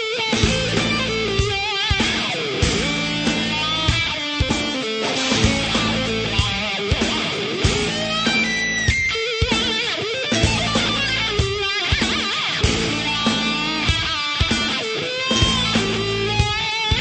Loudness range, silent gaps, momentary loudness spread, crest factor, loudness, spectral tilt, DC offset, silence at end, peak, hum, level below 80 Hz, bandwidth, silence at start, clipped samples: 1 LU; none; 3 LU; 18 dB; -19 LUFS; -3.5 dB/octave; under 0.1%; 0 s; -2 dBFS; none; -32 dBFS; 9 kHz; 0 s; under 0.1%